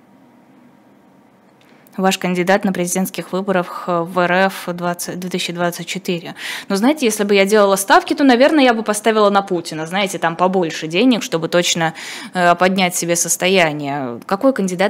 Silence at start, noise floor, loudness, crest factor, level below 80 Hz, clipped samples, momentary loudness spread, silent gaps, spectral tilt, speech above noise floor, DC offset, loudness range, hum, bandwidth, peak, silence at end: 1.95 s; -49 dBFS; -16 LUFS; 16 dB; -64 dBFS; under 0.1%; 11 LU; none; -4 dB/octave; 33 dB; under 0.1%; 6 LU; none; 16.5 kHz; 0 dBFS; 0 s